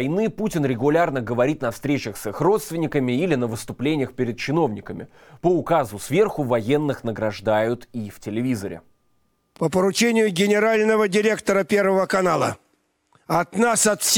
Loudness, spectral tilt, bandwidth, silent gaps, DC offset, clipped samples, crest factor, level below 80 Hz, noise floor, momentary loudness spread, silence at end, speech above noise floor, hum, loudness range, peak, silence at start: -21 LUFS; -4.5 dB/octave; 19 kHz; none; under 0.1%; under 0.1%; 16 dB; -54 dBFS; -67 dBFS; 9 LU; 0 s; 46 dB; none; 4 LU; -6 dBFS; 0 s